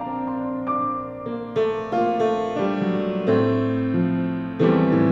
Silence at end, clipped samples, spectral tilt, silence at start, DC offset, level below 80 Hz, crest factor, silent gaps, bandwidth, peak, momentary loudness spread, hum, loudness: 0 s; under 0.1%; -9 dB/octave; 0 s; under 0.1%; -54 dBFS; 16 dB; none; 7.2 kHz; -6 dBFS; 8 LU; none; -23 LUFS